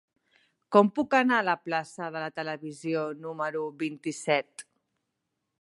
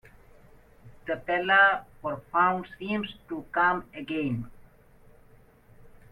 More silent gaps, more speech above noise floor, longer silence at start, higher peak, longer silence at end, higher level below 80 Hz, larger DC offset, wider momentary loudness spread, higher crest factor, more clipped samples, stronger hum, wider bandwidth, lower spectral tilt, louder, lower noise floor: neither; first, 54 dB vs 29 dB; second, 0.7 s vs 0.85 s; first, -4 dBFS vs -10 dBFS; first, 1 s vs 0.25 s; second, -78 dBFS vs -58 dBFS; neither; second, 13 LU vs 16 LU; about the same, 24 dB vs 20 dB; neither; neither; second, 11.5 kHz vs 14.5 kHz; second, -5 dB/octave vs -7 dB/octave; about the same, -28 LUFS vs -26 LUFS; first, -82 dBFS vs -56 dBFS